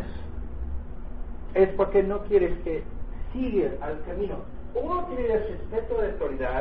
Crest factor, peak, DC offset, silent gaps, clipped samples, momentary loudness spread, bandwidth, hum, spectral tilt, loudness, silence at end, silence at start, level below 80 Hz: 18 dB; -8 dBFS; 2%; none; under 0.1%; 15 LU; 4.4 kHz; none; -11 dB/octave; -28 LUFS; 0 s; 0 s; -36 dBFS